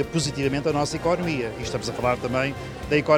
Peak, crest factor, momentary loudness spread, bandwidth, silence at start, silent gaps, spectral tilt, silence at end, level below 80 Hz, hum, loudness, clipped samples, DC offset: -6 dBFS; 18 dB; 5 LU; 18 kHz; 0 s; none; -5 dB/octave; 0 s; -44 dBFS; none; -25 LUFS; under 0.1%; under 0.1%